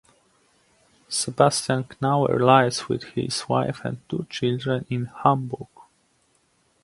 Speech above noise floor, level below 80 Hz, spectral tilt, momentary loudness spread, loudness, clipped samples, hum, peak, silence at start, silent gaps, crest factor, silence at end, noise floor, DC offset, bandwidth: 43 dB; -60 dBFS; -5 dB/octave; 13 LU; -23 LUFS; under 0.1%; none; 0 dBFS; 1.1 s; none; 24 dB; 1.2 s; -65 dBFS; under 0.1%; 11.5 kHz